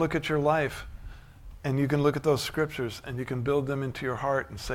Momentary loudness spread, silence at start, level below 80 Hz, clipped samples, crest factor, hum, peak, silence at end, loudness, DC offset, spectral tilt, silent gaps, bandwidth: 12 LU; 0 s; -48 dBFS; under 0.1%; 16 dB; none; -12 dBFS; 0 s; -28 LUFS; under 0.1%; -6 dB/octave; none; 16.5 kHz